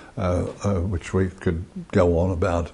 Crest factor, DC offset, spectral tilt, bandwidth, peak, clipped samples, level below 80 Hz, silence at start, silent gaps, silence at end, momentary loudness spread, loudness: 18 dB; under 0.1%; -7.5 dB/octave; 10.5 kHz; -6 dBFS; under 0.1%; -34 dBFS; 0 s; none; 0 s; 7 LU; -24 LUFS